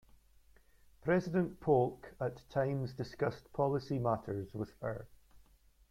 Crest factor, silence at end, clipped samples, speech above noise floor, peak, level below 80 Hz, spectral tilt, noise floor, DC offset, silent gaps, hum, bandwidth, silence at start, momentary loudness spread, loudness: 20 dB; 0.55 s; under 0.1%; 30 dB; -18 dBFS; -64 dBFS; -8.5 dB/octave; -65 dBFS; under 0.1%; none; none; 15.5 kHz; 1.05 s; 11 LU; -36 LUFS